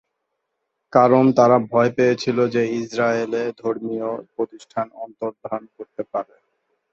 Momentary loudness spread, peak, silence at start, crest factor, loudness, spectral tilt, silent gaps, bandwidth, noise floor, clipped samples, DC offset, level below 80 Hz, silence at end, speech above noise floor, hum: 16 LU; -2 dBFS; 0.95 s; 20 dB; -20 LUFS; -6.5 dB/octave; none; 7.8 kHz; -77 dBFS; under 0.1%; under 0.1%; -64 dBFS; 0.7 s; 57 dB; none